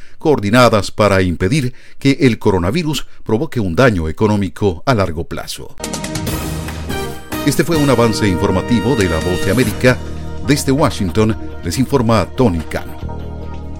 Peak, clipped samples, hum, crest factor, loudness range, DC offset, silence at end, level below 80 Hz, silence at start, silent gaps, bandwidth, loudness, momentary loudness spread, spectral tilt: 0 dBFS; under 0.1%; none; 14 dB; 4 LU; under 0.1%; 0 s; -32 dBFS; 0 s; none; 17 kHz; -16 LUFS; 12 LU; -6 dB/octave